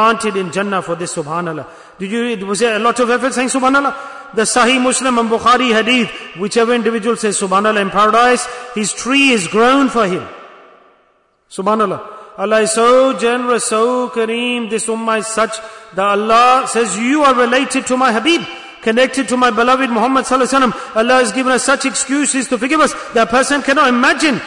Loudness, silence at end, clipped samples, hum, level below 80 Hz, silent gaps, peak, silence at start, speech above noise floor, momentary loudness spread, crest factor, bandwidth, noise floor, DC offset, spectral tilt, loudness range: -13 LUFS; 0 s; under 0.1%; none; -52 dBFS; none; -2 dBFS; 0 s; 43 dB; 10 LU; 12 dB; 11 kHz; -56 dBFS; under 0.1%; -3 dB/octave; 3 LU